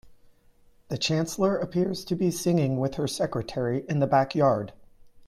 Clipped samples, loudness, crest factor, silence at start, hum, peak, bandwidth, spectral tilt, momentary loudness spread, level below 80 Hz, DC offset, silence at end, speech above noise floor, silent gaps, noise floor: under 0.1%; -26 LUFS; 16 dB; 0.05 s; none; -10 dBFS; 16 kHz; -6 dB/octave; 6 LU; -56 dBFS; under 0.1%; 0 s; 33 dB; none; -58 dBFS